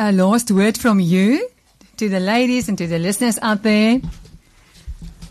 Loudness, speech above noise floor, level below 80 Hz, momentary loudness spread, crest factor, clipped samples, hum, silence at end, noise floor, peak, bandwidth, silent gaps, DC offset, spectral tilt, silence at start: -17 LUFS; 32 dB; -42 dBFS; 15 LU; 12 dB; under 0.1%; none; 0.05 s; -48 dBFS; -6 dBFS; 13 kHz; none; under 0.1%; -5.5 dB/octave; 0 s